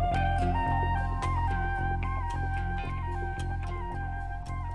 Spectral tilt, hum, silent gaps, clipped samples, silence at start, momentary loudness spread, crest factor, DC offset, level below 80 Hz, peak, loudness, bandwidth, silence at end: -7 dB/octave; none; none; under 0.1%; 0 s; 8 LU; 14 dB; under 0.1%; -34 dBFS; -16 dBFS; -32 LUFS; 11 kHz; 0 s